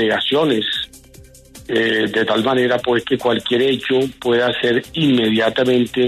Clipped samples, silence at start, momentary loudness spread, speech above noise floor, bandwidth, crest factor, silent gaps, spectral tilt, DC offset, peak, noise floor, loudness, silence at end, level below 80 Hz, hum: under 0.1%; 0 s; 3 LU; 27 dB; 13.5 kHz; 14 dB; none; -5.5 dB/octave; under 0.1%; -4 dBFS; -43 dBFS; -17 LUFS; 0 s; -52 dBFS; none